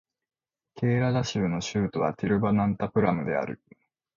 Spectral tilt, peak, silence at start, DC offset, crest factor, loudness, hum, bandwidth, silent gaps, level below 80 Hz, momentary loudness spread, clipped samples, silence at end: -6.5 dB/octave; -10 dBFS; 0.75 s; under 0.1%; 16 dB; -27 LUFS; none; 7.2 kHz; none; -54 dBFS; 6 LU; under 0.1%; 0.6 s